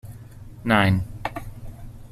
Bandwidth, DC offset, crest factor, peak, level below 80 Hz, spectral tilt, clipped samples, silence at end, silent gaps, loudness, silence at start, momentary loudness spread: 14.5 kHz; under 0.1%; 22 dB; -4 dBFS; -42 dBFS; -6.5 dB/octave; under 0.1%; 0.05 s; none; -23 LUFS; 0.05 s; 24 LU